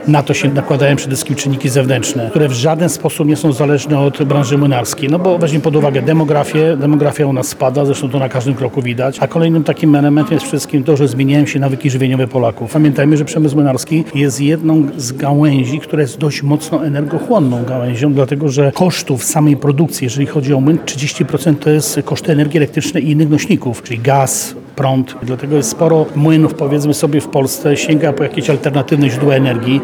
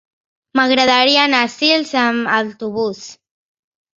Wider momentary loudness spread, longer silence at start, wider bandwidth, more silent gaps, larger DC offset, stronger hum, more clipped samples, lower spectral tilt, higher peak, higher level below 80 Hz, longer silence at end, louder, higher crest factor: second, 5 LU vs 11 LU; second, 0 s vs 0.55 s; first, 19 kHz vs 7.8 kHz; neither; neither; neither; neither; first, -6 dB/octave vs -3 dB/octave; about the same, 0 dBFS vs 0 dBFS; first, -54 dBFS vs -62 dBFS; second, 0 s vs 0.85 s; about the same, -13 LUFS vs -15 LUFS; about the same, 12 dB vs 16 dB